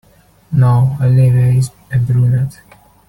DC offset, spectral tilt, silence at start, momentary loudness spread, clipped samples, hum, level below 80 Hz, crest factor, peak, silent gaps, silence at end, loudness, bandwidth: under 0.1%; -8.5 dB/octave; 0.5 s; 8 LU; under 0.1%; none; -42 dBFS; 10 dB; -2 dBFS; none; 0.6 s; -13 LUFS; 11.5 kHz